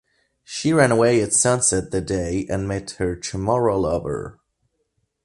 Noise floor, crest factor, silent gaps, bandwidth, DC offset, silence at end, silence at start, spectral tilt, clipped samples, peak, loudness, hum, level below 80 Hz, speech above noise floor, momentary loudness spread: -71 dBFS; 18 dB; none; 11.5 kHz; under 0.1%; 0.95 s; 0.5 s; -4.5 dB/octave; under 0.1%; -4 dBFS; -20 LUFS; none; -42 dBFS; 51 dB; 12 LU